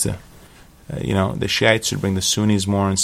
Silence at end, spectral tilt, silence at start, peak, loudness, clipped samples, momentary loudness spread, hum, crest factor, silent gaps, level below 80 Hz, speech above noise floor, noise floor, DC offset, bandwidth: 0 s; -4 dB/octave; 0 s; 0 dBFS; -19 LUFS; under 0.1%; 11 LU; none; 20 dB; none; -44 dBFS; 27 dB; -46 dBFS; under 0.1%; 16 kHz